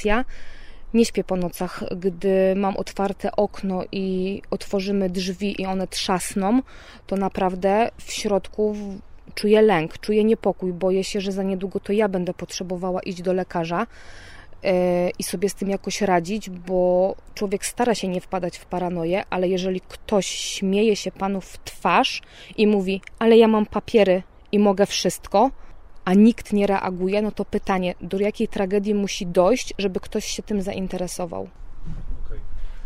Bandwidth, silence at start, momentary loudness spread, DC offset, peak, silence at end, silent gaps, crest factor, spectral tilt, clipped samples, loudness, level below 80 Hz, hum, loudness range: 16 kHz; 0 s; 11 LU; under 0.1%; -4 dBFS; 0 s; none; 18 dB; -5 dB/octave; under 0.1%; -22 LUFS; -40 dBFS; none; 5 LU